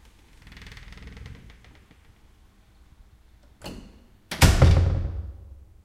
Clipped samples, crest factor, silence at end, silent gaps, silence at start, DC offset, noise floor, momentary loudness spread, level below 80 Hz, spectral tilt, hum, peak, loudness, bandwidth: under 0.1%; 24 dB; 0.4 s; none; 0.6 s; under 0.1%; -55 dBFS; 27 LU; -32 dBFS; -5 dB/octave; none; -2 dBFS; -21 LUFS; 16 kHz